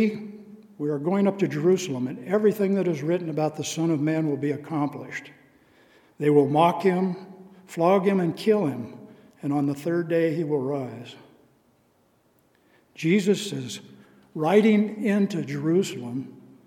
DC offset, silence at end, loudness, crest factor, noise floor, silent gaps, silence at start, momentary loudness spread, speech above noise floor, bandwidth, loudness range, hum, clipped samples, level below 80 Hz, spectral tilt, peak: under 0.1%; 0.35 s; -24 LUFS; 20 dB; -64 dBFS; none; 0 s; 16 LU; 40 dB; 16.5 kHz; 6 LU; none; under 0.1%; -76 dBFS; -6.5 dB/octave; -6 dBFS